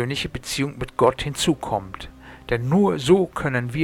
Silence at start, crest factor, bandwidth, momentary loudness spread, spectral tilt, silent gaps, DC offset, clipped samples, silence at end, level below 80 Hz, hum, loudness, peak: 0 s; 18 dB; 17.5 kHz; 15 LU; -5.5 dB/octave; none; under 0.1%; under 0.1%; 0 s; -44 dBFS; none; -22 LUFS; -4 dBFS